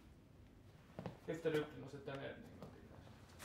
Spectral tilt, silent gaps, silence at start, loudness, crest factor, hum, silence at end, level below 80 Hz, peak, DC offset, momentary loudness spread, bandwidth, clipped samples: -6 dB/octave; none; 0 s; -47 LUFS; 22 dB; none; 0 s; -70 dBFS; -26 dBFS; under 0.1%; 23 LU; 16 kHz; under 0.1%